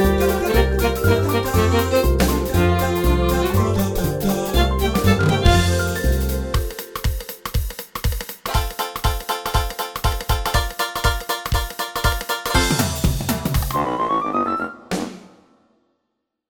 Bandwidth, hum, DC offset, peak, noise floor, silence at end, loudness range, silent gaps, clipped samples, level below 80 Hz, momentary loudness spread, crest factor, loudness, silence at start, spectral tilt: over 20 kHz; none; under 0.1%; 0 dBFS; -76 dBFS; 1.25 s; 6 LU; none; under 0.1%; -26 dBFS; 9 LU; 18 dB; -20 LUFS; 0 s; -5 dB/octave